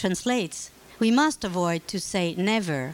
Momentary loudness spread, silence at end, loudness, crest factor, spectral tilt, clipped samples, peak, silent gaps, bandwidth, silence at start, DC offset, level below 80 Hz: 10 LU; 0 s; -25 LUFS; 14 dB; -4.5 dB/octave; under 0.1%; -10 dBFS; none; 16.5 kHz; 0 s; under 0.1%; -56 dBFS